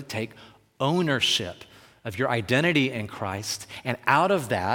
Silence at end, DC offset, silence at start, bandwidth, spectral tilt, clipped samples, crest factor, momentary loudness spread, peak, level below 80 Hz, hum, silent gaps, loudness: 0 s; under 0.1%; 0 s; 18 kHz; -4.5 dB/octave; under 0.1%; 20 dB; 15 LU; -6 dBFS; -64 dBFS; none; none; -25 LUFS